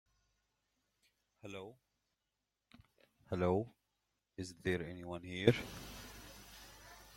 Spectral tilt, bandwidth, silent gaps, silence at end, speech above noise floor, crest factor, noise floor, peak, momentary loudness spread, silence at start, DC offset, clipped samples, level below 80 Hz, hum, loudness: -6 dB/octave; 16.5 kHz; none; 0 s; 51 dB; 30 dB; -89 dBFS; -12 dBFS; 22 LU; 1.45 s; under 0.1%; under 0.1%; -66 dBFS; none; -39 LUFS